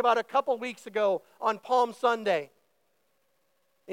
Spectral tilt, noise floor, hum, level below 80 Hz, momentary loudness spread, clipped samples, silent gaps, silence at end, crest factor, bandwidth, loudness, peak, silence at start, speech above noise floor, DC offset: -4 dB/octave; -74 dBFS; none; under -90 dBFS; 7 LU; under 0.1%; none; 0 s; 18 dB; 16.5 kHz; -28 LUFS; -12 dBFS; 0 s; 46 dB; under 0.1%